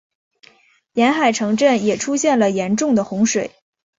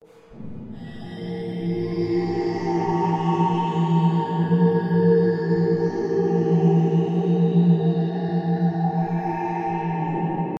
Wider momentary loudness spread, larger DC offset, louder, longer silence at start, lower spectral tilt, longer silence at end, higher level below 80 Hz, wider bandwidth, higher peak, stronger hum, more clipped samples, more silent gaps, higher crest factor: second, 5 LU vs 12 LU; neither; first, -17 LUFS vs -22 LUFS; first, 0.95 s vs 0.3 s; second, -4 dB/octave vs -9.5 dB/octave; first, 0.5 s vs 0 s; about the same, -60 dBFS vs -58 dBFS; first, 8 kHz vs 6.2 kHz; first, -4 dBFS vs -8 dBFS; neither; neither; neither; about the same, 16 dB vs 14 dB